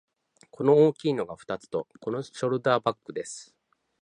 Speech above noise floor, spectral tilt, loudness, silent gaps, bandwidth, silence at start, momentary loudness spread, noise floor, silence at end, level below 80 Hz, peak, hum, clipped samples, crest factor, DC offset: 31 dB; -6 dB/octave; -27 LUFS; none; 10 kHz; 0.6 s; 16 LU; -58 dBFS; 0.6 s; -70 dBFS; -8 dBFS; none; under 0.1%; 20 dB; under 0.1%